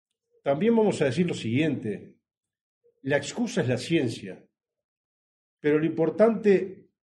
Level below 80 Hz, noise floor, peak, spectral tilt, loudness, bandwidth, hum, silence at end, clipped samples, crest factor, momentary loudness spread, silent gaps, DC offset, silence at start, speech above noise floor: -68 dBFS; under -90 dBFS; -10 dBFS; -6.5 dB/octave; -25 LUFS; 11 kHz; none; 0.3 s; under 0.1%; 18 dB; 14 LU; 2.37-2.41 s, 2.61-2.81 s, 4.84-5.57 s; under 0.1%; 0.45 s; over 65 dB